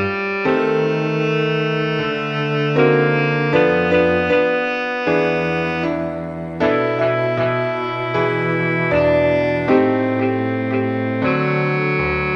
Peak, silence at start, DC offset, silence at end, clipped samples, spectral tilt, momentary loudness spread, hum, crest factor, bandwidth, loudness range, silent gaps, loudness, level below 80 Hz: -2 dBFS; 0 s; under 0.1%; 0 s; under 0.1%; -7.5 dB/octave; 5 LU; none; 16 dB; 7 kHz; 3 LU; none; -18 LUFS; -46 dBFS